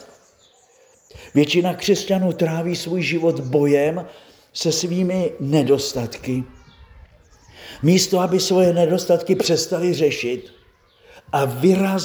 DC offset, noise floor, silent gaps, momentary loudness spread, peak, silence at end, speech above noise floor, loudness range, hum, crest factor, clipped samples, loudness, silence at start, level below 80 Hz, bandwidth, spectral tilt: under 0.1%; -55 dBFS; none; 10 LU; -2 dBFS; 0 s; 36 dB; 4 LU; none; 18 dB; under 0.1%; -19 LUFS; 0 s; -54 dBFS; over 20 kHz; -5 dB/octave